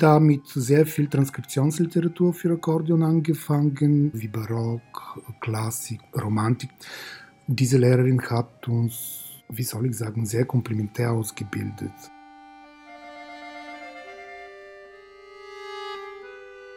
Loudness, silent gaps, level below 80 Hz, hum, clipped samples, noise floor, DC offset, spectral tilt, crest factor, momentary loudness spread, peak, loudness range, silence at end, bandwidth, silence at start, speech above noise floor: -24 LUFS; none; -66 dBFS; none; under 0.1%; -47 dBFS; under 0.1%; -7 dB/octave; 22 dB; 20 LU; -2 dBFS; 17 LU; 0 s; 17 kHz; 0 s; 25 dB